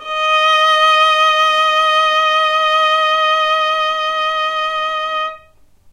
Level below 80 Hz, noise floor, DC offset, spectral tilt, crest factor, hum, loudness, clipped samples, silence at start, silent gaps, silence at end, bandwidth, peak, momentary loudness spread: -56 dBFS; -47 dBFS; under 0.1%; 1.5 dB/octave; 12 dB; none; -13 LUFS; under 0.1%; 0 s; none; 0.55 s; 15.5 kHz; -2 dBFS; 8 LU